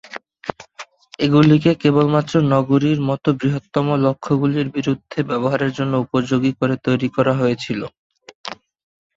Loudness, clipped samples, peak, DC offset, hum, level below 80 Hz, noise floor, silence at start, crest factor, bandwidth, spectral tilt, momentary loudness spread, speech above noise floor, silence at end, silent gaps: -18 LUFS; under 0.1%; -2 dBFS; under 0.1%; none; -54 dBFS; -41 dBFS; 0.05 s; 16 dB; 7.8 kHz; -7.5 dB/octave; 18 LU; 24 dB; 0.65 s; 7.98-8.10 s, 8.35-8.44 s